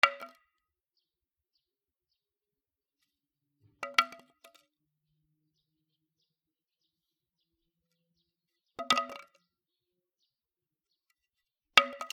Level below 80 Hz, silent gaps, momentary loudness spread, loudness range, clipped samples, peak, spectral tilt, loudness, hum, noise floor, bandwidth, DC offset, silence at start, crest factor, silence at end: -82 dBFS; none; 22 LU; 4 LU; under 0.1%; -2 dBFS; 0 dB/octave; -28 LUFS; none; under -90 dBFS; 16 kHz; under 0.1%; 0.05 s; 36 dB; 0.05 s